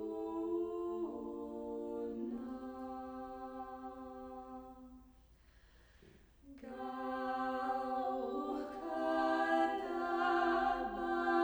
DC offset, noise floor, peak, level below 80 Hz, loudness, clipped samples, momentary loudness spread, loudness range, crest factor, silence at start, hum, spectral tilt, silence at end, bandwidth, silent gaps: under 0.1%; -64 dBFS; -22 dBFS; -66 dBFS; -39 LUFS; under 0.1%; 16 LU; 15 LU; 18 dB; 0 s; none; -5.5 dB/octave; 0 s; over 20 kHz; none